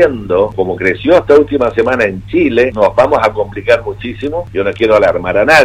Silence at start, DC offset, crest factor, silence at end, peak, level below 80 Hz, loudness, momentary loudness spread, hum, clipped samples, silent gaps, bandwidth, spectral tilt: 0 s; under 0.1%; 10 dB; 0 s; 0 dBFS; -36 dBFS; -12 LUFS; 9 LU; none; 0.2%; none; 13.5 kHz; -6 dB/octave